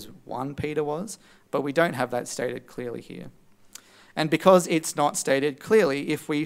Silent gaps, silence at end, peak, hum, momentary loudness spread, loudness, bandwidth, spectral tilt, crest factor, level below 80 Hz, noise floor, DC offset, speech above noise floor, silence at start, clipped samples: none; 0 s; -2 dBFS; none; 17 LU; -25 LUFS; 16 kHz; -4.5 dB/octave; 24 dB; -62 dBFS; -50 dBFS; under 0.1%; 25 dB; 0 s; under 0.1%